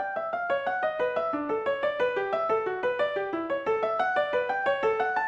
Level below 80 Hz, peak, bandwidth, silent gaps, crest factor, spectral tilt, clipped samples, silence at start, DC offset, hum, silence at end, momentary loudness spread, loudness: -66 dBFS; -14 dBFS; 8 kHz; none; 14 dB; -5.5 dB/octave; under 0.1%; 0 s; under 0.1%; none; 0 s; 3 LU; -28 LUFS